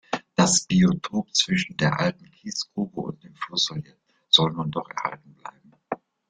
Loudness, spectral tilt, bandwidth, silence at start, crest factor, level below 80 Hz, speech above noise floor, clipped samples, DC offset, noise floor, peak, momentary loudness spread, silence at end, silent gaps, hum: -23 LUFS; -3.5 dB/octave; 9.6 kHz; 0.1 s; 24 dB; -58 dBFS; 20 dB; under 0.1%; under 0.1%; -44 dBFS; -2 dBFS; 18 LU; 0.35 s; none; none